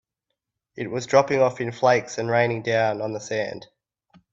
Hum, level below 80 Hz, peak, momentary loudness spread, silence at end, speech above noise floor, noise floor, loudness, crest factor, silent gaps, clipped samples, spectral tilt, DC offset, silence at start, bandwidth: none; -64 dBFS; -4 dBFS; 11 LU; 0.7 s; 59 dB; -82 dBFS; -23 LUFS; 20 dB; none; under 0.1%; -5 dB/octave; under 0.1%; 0.75 s; 7.8 kHz